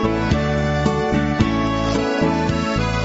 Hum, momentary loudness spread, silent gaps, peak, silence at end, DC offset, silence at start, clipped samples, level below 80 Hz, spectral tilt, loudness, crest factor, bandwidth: none; 1 LU; none; -2 dBFS; 0 s; under 0.1%; 0 s; under 0.1%; -30 dBFS; -6.5 dB/octave; -19 LUFS; 16 dB; 8 kHz